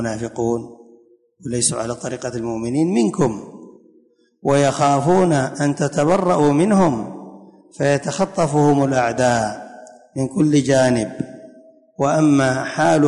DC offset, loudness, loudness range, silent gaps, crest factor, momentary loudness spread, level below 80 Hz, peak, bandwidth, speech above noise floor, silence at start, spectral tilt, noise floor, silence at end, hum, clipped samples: under 0.1%; -18 LUFS; 5 LU; none; 14 dB; 12 LU; -52 dBFS; -4 dBFS; 11 kHz; 39 dB; 0 s; -5.5 dB/octave; -56 dBFS; 0 s; none; under 0.1%